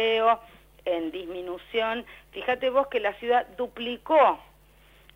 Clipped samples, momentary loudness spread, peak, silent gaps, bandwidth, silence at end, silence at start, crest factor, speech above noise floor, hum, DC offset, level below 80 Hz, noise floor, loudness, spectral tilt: under 0.1%; 15 LU; -10 dBFS; none; 16 kHz; 0.75 s; 0 s; 18 dB; 30 dB; none; under 0.1%; -58 dBFS; -56 dBFS; -26 LUFS; -4.5 dB/octave